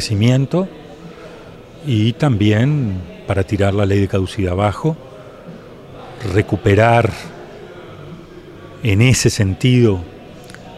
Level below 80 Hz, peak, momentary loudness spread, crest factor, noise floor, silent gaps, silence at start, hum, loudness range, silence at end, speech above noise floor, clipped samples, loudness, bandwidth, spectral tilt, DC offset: -44 dBFS; 0 dBFS; 23 LU; 16 dB; -37 dBFS; none; 0 s; none; 3 LU; 0 s; 22 dB; under 0.1%; -16 LUFS; 13.5 kHz; -6 dB/octave; under 0.1%